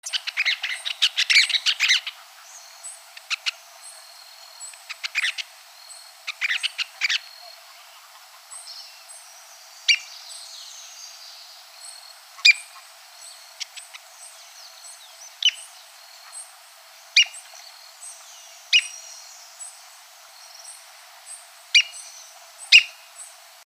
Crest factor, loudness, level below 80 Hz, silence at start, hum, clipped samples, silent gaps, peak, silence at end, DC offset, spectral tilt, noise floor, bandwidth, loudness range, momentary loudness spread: 28 dB; -20 LUFS; under -90 dBFS; 0.05 s; none; under 0.1%; none; 0 dBFS; 0.4 s; under 0.1%; 9 dB/octave; -48 dBFS; 15.5 kHz; 9 LU; 26 LU